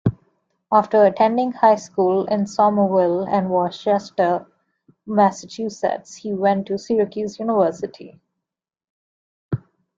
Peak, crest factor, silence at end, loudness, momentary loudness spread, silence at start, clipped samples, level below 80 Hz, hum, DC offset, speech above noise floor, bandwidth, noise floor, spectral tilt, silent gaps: -2 dBFS; 18 dB; 0.4 s; -20 LUFS; 13 LU; 0.05 s; under 0.1%; -58 dBFS; none; under 0.1%; 69 dB; 7.8 kHz; -87 dBFS; -7 dB/octave; 8.90-9.49 s